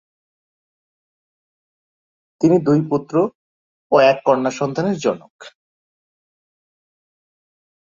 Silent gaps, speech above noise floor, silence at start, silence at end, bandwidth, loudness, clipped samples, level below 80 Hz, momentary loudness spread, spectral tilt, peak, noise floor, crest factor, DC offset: 3.35-3.90 s, 5.30-5.39 s; over 73 dB; 2.4 s; 2.35 s; 7.6 kHz; -18 LUFS; under 0.1%; -64 dBFS; 8 LU; -6.5 dB/octave; -2 dBFS; under -90 dBFS; 20 dB; under 0.1%